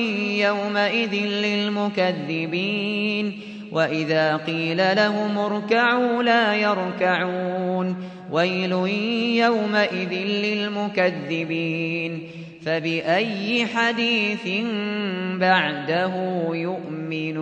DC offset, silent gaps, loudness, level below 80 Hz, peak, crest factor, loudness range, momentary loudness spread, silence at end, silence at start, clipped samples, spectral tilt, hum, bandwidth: under 0.1%; none; -22 LUFS; -70 dBFS; -6 dBFS; 16 dB; 3 LU; 8 LU; 0 s; 0 s; under 0.1%; -6 dB/octave; none; 8.6 kHz